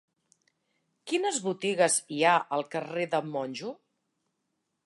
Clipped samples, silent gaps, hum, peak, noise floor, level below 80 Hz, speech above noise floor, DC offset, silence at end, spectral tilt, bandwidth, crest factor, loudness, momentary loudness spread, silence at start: under 0.1%; none; none; -10 dBFS; -80 dBFS; -84 dBFS; 52 dB; under 0.1%; 1.1 s; -3 dB/octave; 11.5 kHz; 20 dB; -28 LUFS; 12 LU; 1.05 s